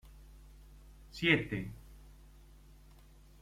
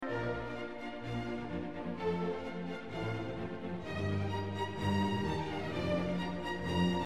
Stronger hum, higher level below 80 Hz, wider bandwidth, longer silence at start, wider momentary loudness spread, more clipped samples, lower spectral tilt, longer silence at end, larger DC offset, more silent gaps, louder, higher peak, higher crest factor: neither; about the same, -56 dBFS vs -56 dBFS; first, 16 kHz vs 12.5 kHz; about the same, 0.05 s vs 0 s; first, 23 LU vs 8 LU; neither; second, -5.5 dB/octave vs -7 dB/octave; first, 1.3 s vs 0 s; second, under 0.1% vs 0.3%; neither; first, -32 LUFS vs -37 LUFS; first, -12 dBFS vs -20 dBFS; first, 28 dB vs 16 dB